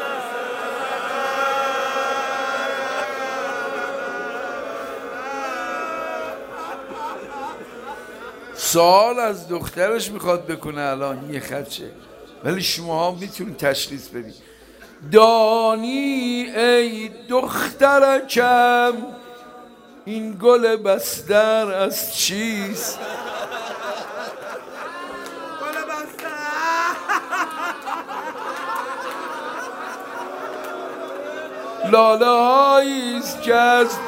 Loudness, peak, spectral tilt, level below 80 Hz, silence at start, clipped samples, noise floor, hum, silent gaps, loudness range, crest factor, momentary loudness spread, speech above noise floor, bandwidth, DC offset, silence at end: -20 LUFS; 0 dBFS; -3 dB/octave; -60 dBFS; 0 s; under 0.1%; -45 dBFS; none; none; 11 LU; 20 dB; 17 LU; 27 dB; 16 kHz; under 0.1%; 0 s